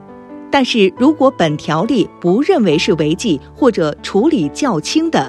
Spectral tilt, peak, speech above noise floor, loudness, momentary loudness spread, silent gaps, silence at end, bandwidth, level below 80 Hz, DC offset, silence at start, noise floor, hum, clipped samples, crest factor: -5.5 dB/octave; 0 dBFS; 20 dB; -14 LUFS; 5 LU; none; 0 s; 12 kHz; -46 dBFS; under 0.1%; 0.1 s; -34 dBFS; none; under 0.1%; 14 dB